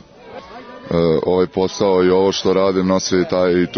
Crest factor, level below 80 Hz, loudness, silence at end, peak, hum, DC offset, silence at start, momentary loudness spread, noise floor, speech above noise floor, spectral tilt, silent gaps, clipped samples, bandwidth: 14 dB; -50 dBFS; -16 LUFS; 0 s; -4 dBFS; none; under 0.1%; 0.25 s; 21 LU; -37 dBFS; 21 dB; -5.5 dB/octave; none; under 0.1%; 6.6 kHz